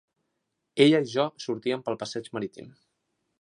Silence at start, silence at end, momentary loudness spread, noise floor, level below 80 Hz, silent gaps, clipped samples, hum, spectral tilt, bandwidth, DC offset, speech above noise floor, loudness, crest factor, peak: 0.75 s; 0.7 s; 15 LU; -80 dBFS; -74 dBFS; none; under 0.1%; none; -5.5 dB/octave; 11 kHz; under 0.1%; 54 dB; -26 LUFS; 22 dB; -6 dBFS